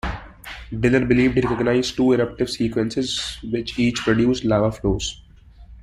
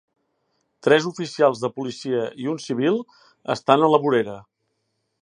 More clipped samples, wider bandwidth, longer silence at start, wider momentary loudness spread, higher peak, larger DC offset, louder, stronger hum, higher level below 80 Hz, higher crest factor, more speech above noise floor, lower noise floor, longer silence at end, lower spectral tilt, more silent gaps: neither; first, 14 kHz vs 10 kHz; second, 0.05 s vs 0.85 s; about the same, 12 LU vs 12 LU; second, -4 dBFS vs 0 dBFS; neither; about the same, -21 LUFS vs -22 LUFS; neither; first, -38 dBFS vs -70 dBFS; second, 16 dB vs 22 dB; second, 25 dB vs 53 dB; second, -45 dBFS vs -74 dBFS; second, 0 s vs 0.8 s; about the same, -5.5 dB/octave vs -5.5 dB/octave; neither